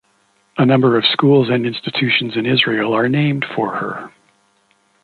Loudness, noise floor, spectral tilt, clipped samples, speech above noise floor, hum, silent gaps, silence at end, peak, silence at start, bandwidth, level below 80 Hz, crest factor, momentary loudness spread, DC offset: -16 LUFS; -59 dBFS; -8 dB/octave; under 0.1%; 44 dB; none; none; 0.95 s; 0 dBFS; 0.55 s; 4.7 kHz; -60 dBFS; 16 dB; 9 LU; under 0.1%